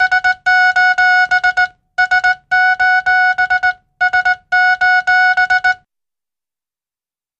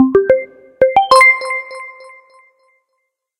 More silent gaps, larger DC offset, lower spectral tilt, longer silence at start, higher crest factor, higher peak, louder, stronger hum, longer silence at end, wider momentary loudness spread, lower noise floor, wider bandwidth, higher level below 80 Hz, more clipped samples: neither; neither; second, 0 dB/octave vs -3.5 dB/octave; about the same, 0 s vs 0 s; about the same, 12 dB vs 14 dB; about the same, -2 dBFS vs 0 dBFS; about the same, -12 LUFS vs -11 LUFS; neither; first, 1.65 s vs 1.5 s; second, 6 LU vs 23 LU; first, under -90 dBFS vs -71 dBFS; second, 8.6 kHz vs 16 kHz; about the same, -52 dBFS vs -52 dBFS; neither